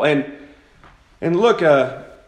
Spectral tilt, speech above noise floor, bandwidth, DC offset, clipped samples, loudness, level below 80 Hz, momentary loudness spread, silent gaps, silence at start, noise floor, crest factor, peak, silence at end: -6.5 dB/octave; 33 dB; 9.4 kHz; under 0.1%; under 0.1%; -17 LUFS; -56 dBFS; 12 LU; none; 0 s; -49 dBFS; 18 dB; 0 dBFS; 0.2 s